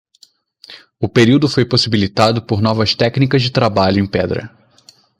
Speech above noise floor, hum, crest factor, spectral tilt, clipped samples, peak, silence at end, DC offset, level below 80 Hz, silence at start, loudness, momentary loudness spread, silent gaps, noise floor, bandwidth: 38 dB; none; 16 dB; -6 dB/octave; under 0.1%; 0 dBFS; 0.7 s; under 0.1%; -48 dBFS; 0.7 s; -14 LUFS; 7 LU; none; -51 dBFS; 11 kHz